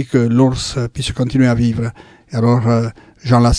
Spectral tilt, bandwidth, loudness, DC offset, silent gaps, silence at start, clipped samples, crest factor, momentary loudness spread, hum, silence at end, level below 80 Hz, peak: -6.5 dB/octave; 10.5 kHz; -16 LUFS; under 0.1%; none; 0 s; under 0.1%; 14 dB; 12 LU; none; 0 s; -30 dBFS; 0 dBFS